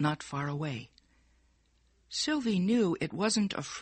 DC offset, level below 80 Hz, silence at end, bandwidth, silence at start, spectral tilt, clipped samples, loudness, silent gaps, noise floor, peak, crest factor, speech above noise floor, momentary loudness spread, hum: under 0.1%; -66 dBFS; 0 s; 8.8 kHz; 0 s; -4.5 dB/octave; under 0.1%; -31 LUFS; none; -69 dBFS; -18 dBFS; 16 dB; 38 dB; 9 LU; none